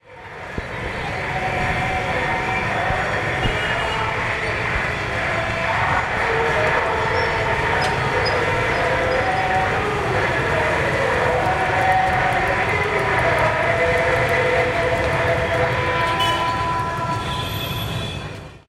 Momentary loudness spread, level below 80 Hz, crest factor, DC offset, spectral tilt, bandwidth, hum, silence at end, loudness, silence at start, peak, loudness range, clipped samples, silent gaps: 7 LU; -36 dBFS; 16 dB; under 0.1%; -5 dB/octave; 16 kHz; none; 0.1 s; -20 LUFS; 0.1 s; -4 dBFS; 3 LU; under 0.1%; none